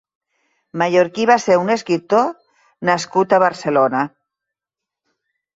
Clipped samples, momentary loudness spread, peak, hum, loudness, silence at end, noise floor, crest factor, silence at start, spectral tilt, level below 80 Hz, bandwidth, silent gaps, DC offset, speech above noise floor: under 0.1%; 9 LU; -2 dBFS; none; -17 LUFS; 1.5 s; -86 dBFS; 16 dB; 0.75 s; -5 dB/octave; -66 dBFS; 8 kHz; none; under 0.1%; 70 dB